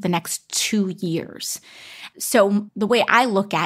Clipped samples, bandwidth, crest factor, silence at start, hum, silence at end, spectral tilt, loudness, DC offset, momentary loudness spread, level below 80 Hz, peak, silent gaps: under 0.1%; 16 kHz; 20 dB; 0 s; none; 0 s; -3.5 dB/octave; -20 LUFS; under 0.1%; 15 LU; -68 dBFS; -2 dBFS; none